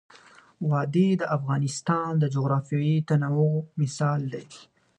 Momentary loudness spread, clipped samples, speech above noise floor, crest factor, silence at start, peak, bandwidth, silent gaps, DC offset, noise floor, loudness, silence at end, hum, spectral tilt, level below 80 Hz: 7 LU; under 0.1%; 29 dB; 16 dB; 0.6 s; -10 dBFS; 10 kHz; none; under 0.1%; -53 dBFS; -25 LUFS; 0.35 s; none; -7 dB/octave; -70 dBFS